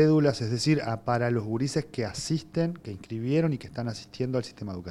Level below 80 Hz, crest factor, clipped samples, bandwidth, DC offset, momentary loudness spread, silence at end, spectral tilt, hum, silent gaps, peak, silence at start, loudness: -58 dBFS; 18 dB; under 0.1%; 12 kHz; under 0.1%; 10 LU; 0 s; -6.5 dB/octave; none; none; -10 dBFS; 0 s; -29 LUFS